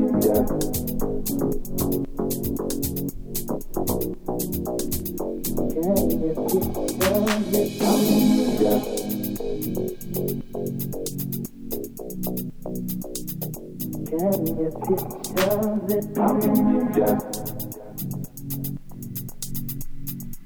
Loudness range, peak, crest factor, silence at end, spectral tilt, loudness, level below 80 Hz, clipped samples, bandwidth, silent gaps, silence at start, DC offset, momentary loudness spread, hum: 8 LU; -6 dBFS; 18 dB; 0 s; -5.5 dB/octave; -25 LUFS; -38 dBFS; under 0.1%; over 20 kHz; none; 0 s; under 0.1%; 12 LU; none